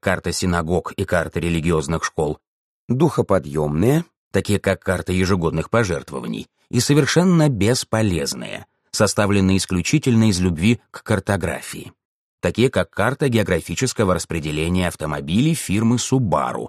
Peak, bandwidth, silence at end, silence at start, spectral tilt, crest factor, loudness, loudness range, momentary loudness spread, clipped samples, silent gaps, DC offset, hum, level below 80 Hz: -2 dBFS; 13 kHz; 0 s; 0.05 s; -5.5 dB/octave; 18 dB; -20 LUFS; 3 LU; 9 LU; under 0.1%; 2.47-2.88 s, 4.16-4.31 s, 12.05-12.38 s; under 0.1%; none; -42 dBFS